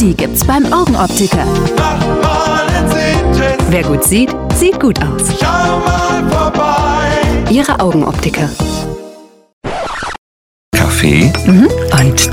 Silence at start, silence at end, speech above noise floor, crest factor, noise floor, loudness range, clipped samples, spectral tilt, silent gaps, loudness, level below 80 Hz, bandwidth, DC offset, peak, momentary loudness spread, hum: 0 s; 0 s; 24 dB; 12 dB; -35 dBFS; 4 LU; under 0.1%; -5 dB/octave; 9.53-9.61 s, 10.18-10.72 s; -11 LUFS; -22 dBFS; 19 kHz; under 0.1%; 0 dBFS; 9 LU; none